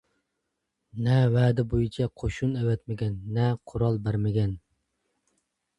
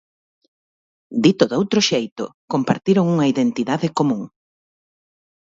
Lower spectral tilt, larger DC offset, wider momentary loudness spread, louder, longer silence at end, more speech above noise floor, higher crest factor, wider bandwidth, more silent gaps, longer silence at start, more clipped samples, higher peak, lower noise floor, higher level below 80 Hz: first, -8.5 dB/octave vs -5.5 dB/octave; neither; about the same, 9 LU vs 11 LU; second, -27 LUFS vs -19 LUFS; about the same, 1.2 s vs 1.15 s; second, 56 dB vs over 72 dB; about the same, 18 dB vs 20 dB; first, 8.6 kHz vs 7.8 kHz; second, none vs 2.12-2.16 s, 2.34-2.48 s; second, 0.95 s vs 1.1 s; neither; second, -10 dBFS vs 0 dBFS; second, -81 dBFS vs under -90 dBFS; first, -46 dBFS vs -62 dBFS